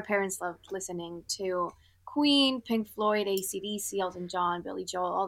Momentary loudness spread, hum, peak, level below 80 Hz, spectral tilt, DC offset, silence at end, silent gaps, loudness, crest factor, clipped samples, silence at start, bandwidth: 12 LU; none; -14 dBFS; -68 dBFS; -3 dB/octave; under 0.1%; 0 s; none; -30 LUFS; 18 dB; under 0.1%; 0 s; 17 kHz